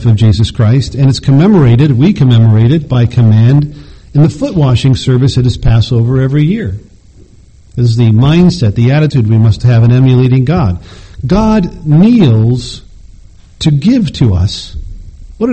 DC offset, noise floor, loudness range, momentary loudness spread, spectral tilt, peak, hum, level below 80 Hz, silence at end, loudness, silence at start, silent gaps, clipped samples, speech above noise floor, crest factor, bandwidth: 0.4%; -39 dBFS; 3 LU; 10 LU; -8 dB/octave; 0 dBFS; none; -28 dBFS; 0 s; -9 LUFS; 0 s; none; 0.4%; 31 dB; 8 dB; 8.6 kHz